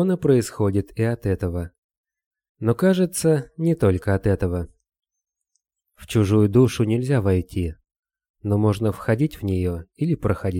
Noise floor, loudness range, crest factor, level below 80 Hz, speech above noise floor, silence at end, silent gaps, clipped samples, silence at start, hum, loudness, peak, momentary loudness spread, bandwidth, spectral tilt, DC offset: -76 dBFS; 2 LU; 18 dB; -44 dBFS; 55 dB; 0 s; 1.78-1.89 s, 1.97-2.04 s, 2.26-2.31 s, 2.49-2.55 s, 7.99-8.03 s, 8.30-8.34 s; under 0.1%; 0 s; none; -22 LUFS; -4 dBFS; 10 LU; 17 kHz; -7 dB/octave; under 0.1%